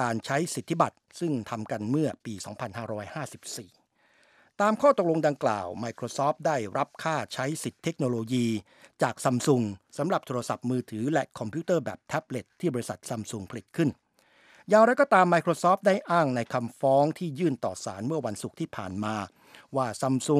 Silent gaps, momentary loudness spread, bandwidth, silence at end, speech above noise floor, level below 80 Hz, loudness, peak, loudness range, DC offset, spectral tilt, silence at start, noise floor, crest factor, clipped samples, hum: none; 13 LU; 15.5 kHz; 0 s; 37 dB; -72 dBFS; -28 LUFS; -6 dBFS; 8 LU; under 0.1%; -5.5 dB/octave; 0 s; -65 dBFS; 20 dB; under 0.1%; none